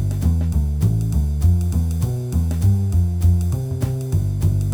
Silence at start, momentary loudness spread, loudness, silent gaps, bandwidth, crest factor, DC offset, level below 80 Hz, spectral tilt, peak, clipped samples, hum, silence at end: 0 s; 5 LU; -20 LUFS; none; 16.5 kHz; 12 dB; under 0.1%; -24 dBFS; -8 dB/octave; -6 dBFS; under 0.1%; none; 0 s